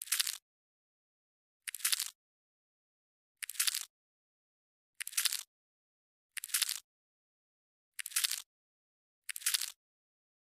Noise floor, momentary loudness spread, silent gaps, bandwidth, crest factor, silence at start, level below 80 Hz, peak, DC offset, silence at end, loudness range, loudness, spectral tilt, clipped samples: under -90 dBFS; 14 LU; 0.42-1.60 s, 2.15-3.35 s, 3.90-4.93 s, 5.47-6.30 s, 6.84-7.92 s, 8.46-9.22 s; 16 kHz; 34 dB; 0 s; under -90 dBFS; -8 dBFS; under 0.1%; 0.7 s; 1 LU; -35 LUFS; 7.5 dB/octave; under 0.1%